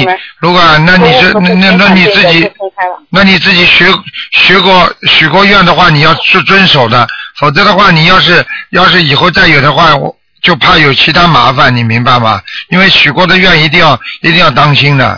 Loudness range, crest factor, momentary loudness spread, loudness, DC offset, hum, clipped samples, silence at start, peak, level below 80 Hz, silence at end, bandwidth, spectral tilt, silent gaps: 1 LU; 6 dB; 8 LU; -4 LUFS; 2%; none; 8%; 0 s; 0 dBFS; -32 dBFS; 0 s; 5.4 kHz; -5.5 dB/octave; none